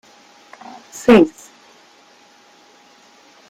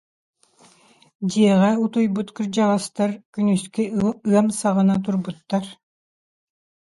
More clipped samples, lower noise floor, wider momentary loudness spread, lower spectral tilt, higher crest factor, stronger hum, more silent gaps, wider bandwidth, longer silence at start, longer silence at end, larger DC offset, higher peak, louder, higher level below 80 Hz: neither; second, -50 dBFS vs -55 dBFS; first, 27 LU vs 9 LU; about the same, -5.5 dB/octave vs -6.5 dB/octave; about the same, 20 dB vs 18 dB; neither; second, none vs 3.25-3.33 s; first, 15.5 kHz vs 11.5 kHz; second, 0.95 s vs 1.2 s; first, 2.2 s vs 1.2 s; neither; about the same, -2 dBFS vs -4 dBFS; first, -14 LUFS vs -21 LUFS; about the same, -56 dBFS vs -60 dBFS